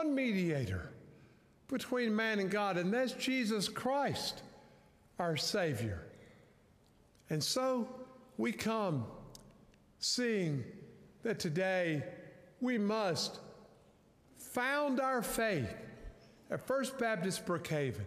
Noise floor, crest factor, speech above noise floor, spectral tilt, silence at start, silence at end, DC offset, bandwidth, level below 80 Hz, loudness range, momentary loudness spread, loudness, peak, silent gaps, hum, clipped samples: -66 dBFS; 16 dB; 31 dB; -4.5 dB/octave; 0 s; 0 s; under 0.1%; 15.5 kHz; -66 dBFS; 3 LU; 17 LU; -36 LUFS; -20 dBFS; none; none; under 0.1%